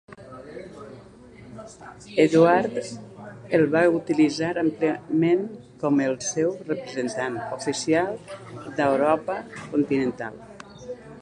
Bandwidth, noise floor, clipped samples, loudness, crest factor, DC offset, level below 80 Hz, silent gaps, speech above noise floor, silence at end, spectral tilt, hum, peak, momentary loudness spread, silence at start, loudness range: 10.5 kHz; -46 dBFS; under 0.1%; -23 LUFS; 20 dB; under 0.1%; -62 dBFS; none; 23 dB; 0 s; -5.5 dB/octave; none; -4 dBFS; 22 LU; 0.1 s; 4 LU